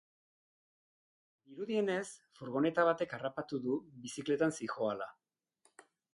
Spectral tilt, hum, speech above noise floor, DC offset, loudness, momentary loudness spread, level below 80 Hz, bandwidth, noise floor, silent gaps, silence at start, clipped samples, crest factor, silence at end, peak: -5 dB/octave; none; 40 dB; under 0.1%; -36 LUFS; 15 LU; -78 dBFS; 11.5 kHz; -75 dBFS; none; 1.5 s; under 0.1%; 20 dB; 1.05 s; -16 dBFS